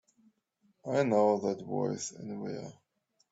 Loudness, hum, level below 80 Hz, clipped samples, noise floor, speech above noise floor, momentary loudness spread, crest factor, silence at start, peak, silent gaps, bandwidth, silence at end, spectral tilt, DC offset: -32 LUFS; none; -78 dBFS; under 0.1%; -73 dBFS; 42 dB; 17 LU; 20 dB; 0.85 s; -14 dBFS; none; 8 kHz; 0.6 s; -5.5 dB/octave; under 0.1%